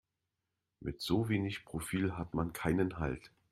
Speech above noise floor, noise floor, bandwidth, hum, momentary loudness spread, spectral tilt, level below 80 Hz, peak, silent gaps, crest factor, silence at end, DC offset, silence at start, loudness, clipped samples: 52 dB; -87 dBFS; 15.5 kHz; none; 10 LU; -6 dB/octave; -54 dBFS; -18 dBFS; none; 20 dB; 0.25 s; under 0.1%; 0.8 s; -36 LUFS; under 0.1%